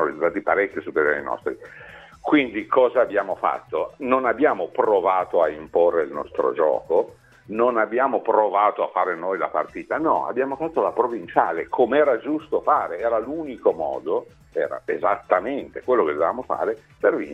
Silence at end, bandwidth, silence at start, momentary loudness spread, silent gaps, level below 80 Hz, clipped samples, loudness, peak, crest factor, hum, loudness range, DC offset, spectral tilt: 0 s; 5.8 kHz; 0 s; 8 LU; none; -60 dBFS; under 0.1%; -22 LUFS; -2 dBFS; 20 dB; none; 3 LU; under 0.1%; -7 dB/octave